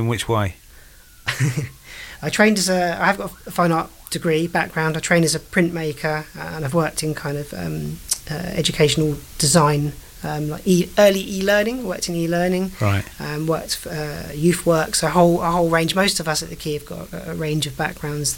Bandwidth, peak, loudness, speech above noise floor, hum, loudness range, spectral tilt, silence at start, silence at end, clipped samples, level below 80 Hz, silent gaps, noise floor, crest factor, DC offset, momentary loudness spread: 17 kHz; -2 dBFS; -20 LUFS; 25 dB; none; 3 LU; -4.5 dB/octave; 0 s; 0 s; under 0.1%; -42 dBFS; none; -45 dBFS; 18 dB; under 0.1%; 12 LU